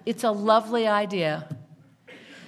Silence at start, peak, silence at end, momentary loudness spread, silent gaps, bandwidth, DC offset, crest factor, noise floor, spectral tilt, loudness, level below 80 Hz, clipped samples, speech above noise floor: 0.05 s; -6 dBFS; 0 s; 16 LU; none; 14 kHz; under 0.1%; 20 dB; -51 dBFS; -5.5 dB/octave; -24 LUFS; -76 dBFS; under 0.1%; 28 dB